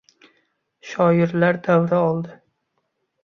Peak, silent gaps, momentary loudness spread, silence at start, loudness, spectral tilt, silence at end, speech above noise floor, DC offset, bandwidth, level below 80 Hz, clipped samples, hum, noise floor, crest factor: -4 dBFS; none; 12 LU; 0.85 s; -19 LUFS; -8.5 dB/octave; 0.9 s; 55 dB; under 0.1%; 6.8 kHz; -62 dBFS; under 0.1%; none; -73 dBFS; 18 dB